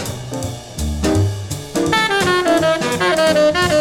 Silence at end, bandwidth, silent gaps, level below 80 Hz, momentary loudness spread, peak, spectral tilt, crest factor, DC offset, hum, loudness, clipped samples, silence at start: 0 s; 18 kHz; none; -32 dBFS; 12 LU; -2 dBFS; -4.5 dB/octave; 14 dB; under 0.1%; none; -17 LUFS; under 0.1%; 0 s